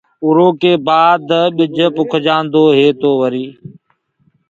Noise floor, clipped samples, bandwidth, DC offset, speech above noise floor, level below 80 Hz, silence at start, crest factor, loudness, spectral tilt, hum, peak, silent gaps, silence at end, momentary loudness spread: -58 dBFS; under 0.1%; 7.4 kHz; under 0.1%; 46 dB; -62 dBFS; 0.2 s; 12 dB; -12 LUFS; -7 dB/octave; none; 0 dBFS; none; 1 s; 5 LU